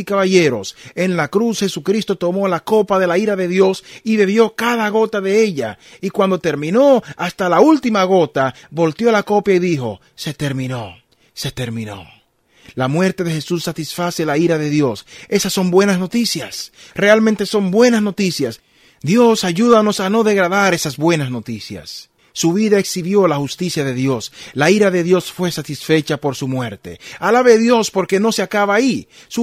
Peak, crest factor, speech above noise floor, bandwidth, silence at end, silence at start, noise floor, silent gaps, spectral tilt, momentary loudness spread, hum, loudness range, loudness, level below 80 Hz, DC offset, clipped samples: 0 dBFS; 16 dB; 37 dB; 15.5 kHz; 0 s; 0 s; -53 dBFS; none; -5 dB/octave; 14 LU; none; 5 LU; -16 LUFS; -56 dBFS; under 0.1%; under 0.1%